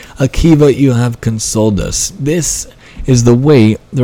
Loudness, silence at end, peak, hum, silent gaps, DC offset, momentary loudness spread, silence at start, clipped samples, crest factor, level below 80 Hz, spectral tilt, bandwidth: -11 LUFS; 0 s; 0 dBFS; none; none; under 0.1%; 8 LU; 0 s; 0.8%; 10 dB; -26 dBFS; -5.5 dB/octave; 16.5 kHz